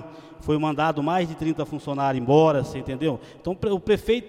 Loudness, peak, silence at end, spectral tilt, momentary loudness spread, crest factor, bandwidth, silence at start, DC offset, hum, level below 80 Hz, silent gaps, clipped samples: -24 LUFS; -6 dBFS; 0 s; -7 dB/octave; 13 LU; 18 dB; 14.5 kHz; 0 s; under 0.1%; none; -48 dBFS; none; under 0.1%